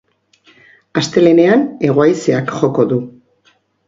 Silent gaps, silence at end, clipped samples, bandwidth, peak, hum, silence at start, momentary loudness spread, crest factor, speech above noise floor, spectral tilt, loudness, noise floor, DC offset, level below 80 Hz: none; 0.75 s; under 0.1%; 7.8 kHz; 0 dBFS; none; 0.95 s; 10 LU; 14 dB; 44 dB; -6.5 dB/octave; -13 LUFS; -56 dBFS; under 0.1%; -56 dBFS